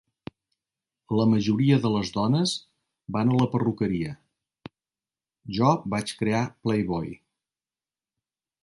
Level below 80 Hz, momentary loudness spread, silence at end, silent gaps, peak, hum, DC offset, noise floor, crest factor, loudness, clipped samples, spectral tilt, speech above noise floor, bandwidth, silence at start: -56 dBFS; 15 LU; 1.5 s; none; -6 dBFS; none; under 0.1%; under -90 dBFS; 20 dB; -25 LUFS; under 0.1%; -6.5 dB/octave; over 66 dB; 11.5 kHz; 1.1 s